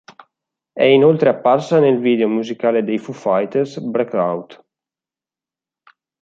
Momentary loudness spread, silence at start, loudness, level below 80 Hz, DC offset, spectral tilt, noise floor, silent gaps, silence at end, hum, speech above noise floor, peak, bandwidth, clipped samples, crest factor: 10 LU; 0.75 s; -16 LUFS; -68 dBFS; under 0.1%; -7 dB/octave; -90 dBFS; none; 1.7 s; none; 74 dB; -2 dBFS; 7.6 kHz; under 0.1%; 16 dB